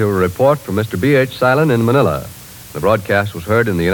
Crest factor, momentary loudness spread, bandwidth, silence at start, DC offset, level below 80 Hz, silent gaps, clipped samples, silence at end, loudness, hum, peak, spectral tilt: 14 dB; 9 LU; 18 kHz; 0 s; under 0.1%; -42 dBFS; none; under 0.1%; 0 s; -15 LUFS; none; -2 dBFS; -6.5 dB/octave